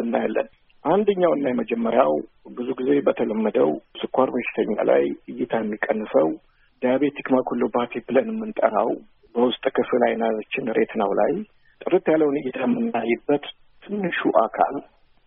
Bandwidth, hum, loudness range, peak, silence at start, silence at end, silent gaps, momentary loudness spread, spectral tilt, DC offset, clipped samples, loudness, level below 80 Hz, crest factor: 3.8 kHz; none; 1 LU; -2 dBFS; 0 s; 0.45 s; none; 10 LU; -4.5 dB/octave; under 0.1%; under 0.1%; -23 LUFS; -62 dBFS; 20 dB